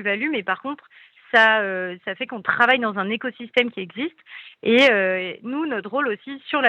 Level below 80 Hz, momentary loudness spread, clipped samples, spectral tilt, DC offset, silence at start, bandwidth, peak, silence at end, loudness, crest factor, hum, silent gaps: -74 dBFS; 15 LU; under 0.1%; -5 dB/octave; under 0.1%; 0 s; 10 kHz; -2 dBFS; 0 s; -21 LUFS; 20 dB; none; none